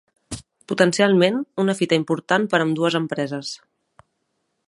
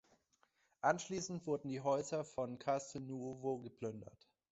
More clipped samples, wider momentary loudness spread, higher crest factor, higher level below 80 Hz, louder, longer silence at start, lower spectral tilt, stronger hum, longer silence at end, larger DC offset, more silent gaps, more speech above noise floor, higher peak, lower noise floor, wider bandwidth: neither; first, 19 LU vs 10 LU; about the same, 20 dB vs 22 dB; first, -58 dBFS vs -76 dBFS; first, -20 LUFS vs -41 LUFS; second, 0.3 s vs 0.85 s; about the same, -5 dB/octave vs -5 dB/octave; neither; first, 1.1 s vs 0.45 s; neither; neither; first, 54 dB vs 37 dB; first, -2 dBFS vs -20 dBFS; second, -73 dBFS vs -78 dBFS; first, 11.5 kHz vs 8 kHz